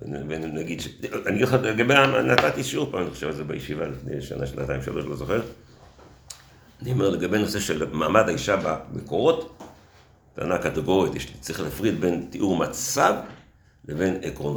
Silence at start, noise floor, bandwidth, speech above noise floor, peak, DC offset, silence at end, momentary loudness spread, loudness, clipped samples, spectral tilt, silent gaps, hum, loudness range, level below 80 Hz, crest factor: 0 s; -54 dBFS; over 20 kHz; 30 dB; 0 dBFS; under 0.1%; 0 s; 13 LU; -24 LUFS; under 0.1%; -5 dB/octave; none; none; 7 LU; -48 dBFS; 26 dB